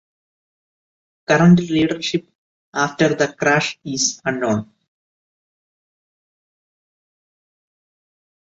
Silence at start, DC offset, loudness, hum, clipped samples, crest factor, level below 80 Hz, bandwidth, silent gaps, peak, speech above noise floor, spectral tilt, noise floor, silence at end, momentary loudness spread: 1.3 s; under 0.1%; -18 LUFS; none; under 0.1%; 20 dB; -58 dBFS; 8 kHz; 2.35-2.72 s; -2 dBFS; over 73 dB; -5 dB/octave; under -90 dBFS; 3.8 s; 11 LU